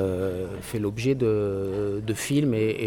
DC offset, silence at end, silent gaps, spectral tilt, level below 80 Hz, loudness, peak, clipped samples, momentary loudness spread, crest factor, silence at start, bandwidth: under 0.1%; 0 s; none; -6.5 dB/octave; -50 dBFS; -26 LUFS; -12 dBFS; under 0.1%; 6 LU; 12 dB; 0 s; 18.5 kHz